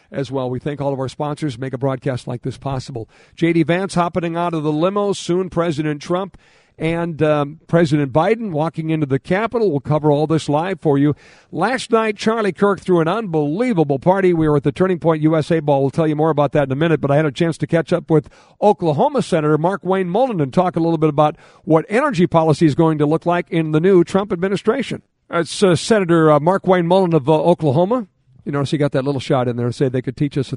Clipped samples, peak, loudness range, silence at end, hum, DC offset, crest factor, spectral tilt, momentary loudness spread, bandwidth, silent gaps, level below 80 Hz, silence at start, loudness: under 0.1%; 0 dBFS; 4 LU; 0 s; none; under 0.1%; 16 dB; -7 dB/octave; 8 LU; 11 kHz; none; -50 dBFS; 0.1 s; -17 LUFS